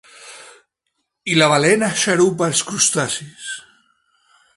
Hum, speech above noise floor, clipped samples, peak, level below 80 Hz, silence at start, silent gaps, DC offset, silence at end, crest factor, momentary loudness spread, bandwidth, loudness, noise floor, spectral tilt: none; 57 dB; under 0.1%; 0 dBFS; -62 dBFS; 0.2 s; none; under 0.1%; 0.95 s; 20 dB; 19 LU; 11.5 kHz; -16 LUFS; -74 dBFS; -3 dB/octave